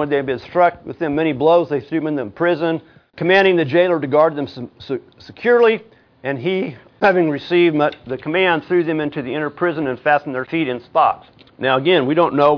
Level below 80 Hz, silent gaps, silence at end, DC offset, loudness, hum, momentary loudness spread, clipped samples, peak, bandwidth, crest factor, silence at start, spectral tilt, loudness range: -58 dBFS; none; 0 s; under 0.1%; -18 LUFS; none; 12 LU; under 0.1%; -2 dBFS; 5.4 kHz; 16 dB; 0 s; -8 dB/octave; 2 LU